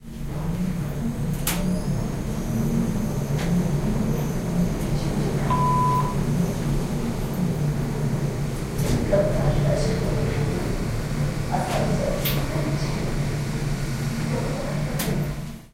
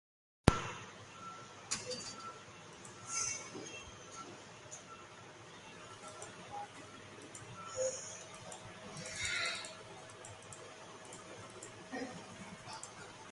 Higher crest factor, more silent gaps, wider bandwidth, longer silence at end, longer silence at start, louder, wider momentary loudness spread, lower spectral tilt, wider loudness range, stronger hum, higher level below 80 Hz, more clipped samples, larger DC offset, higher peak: second, 18 dB vs 38 dB; neither; first, 16 kHz vs 11.5 kHz; about the same, 0.05 s vs 0 s; second, 0 s vs 0.45 s; first, -25 LUFS vs -43 LUFS; second, 5 LU vs 15 LU; first, -6.5 dB/octave vs -3 dB/octave; second, 2 LU vs 8 LU; neither; first, -32 dBFS vs -56 dBFS; neither; neither; about the same, -6 dBFS vs -6 dBFS